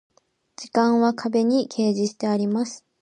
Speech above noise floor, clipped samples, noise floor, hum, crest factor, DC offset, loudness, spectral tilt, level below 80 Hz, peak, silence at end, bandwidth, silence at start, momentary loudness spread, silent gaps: 28 dB; under 0.1%; -50 dBFS; none; 16 dB; under 0.1%; -22 LUFS; -5.5 dB/octave; -74 dBFS; -6 dBFS; 0.25 s; 9.8 kHz; 0.6 s; 7 LU; none